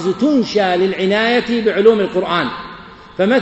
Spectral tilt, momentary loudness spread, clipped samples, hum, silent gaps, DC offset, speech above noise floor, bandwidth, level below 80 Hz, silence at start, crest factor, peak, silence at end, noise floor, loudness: -6 dB/octave; 17 LU; under 0.1%; none; none; under 0.1%; 22 dB; 8.2 kHz; -50 dBFS; 0 s; 16 dB; 0 dBFS; 0 s; -36 dBFS; -15 LUFS